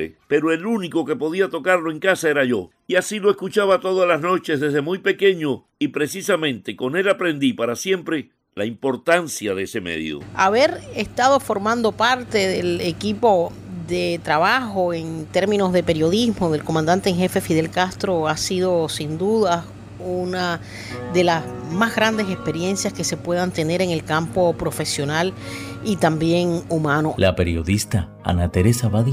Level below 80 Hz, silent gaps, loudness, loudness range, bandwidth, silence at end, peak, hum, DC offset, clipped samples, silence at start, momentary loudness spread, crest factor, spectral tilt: -48 dBFS; none; -20 LUFS; 3 LU; 16 kHz; 0 s; -4 dBFS; none; under 0.1%; under 0.1%; 0 s; 8 LU; 16 dB; -5 dB/octave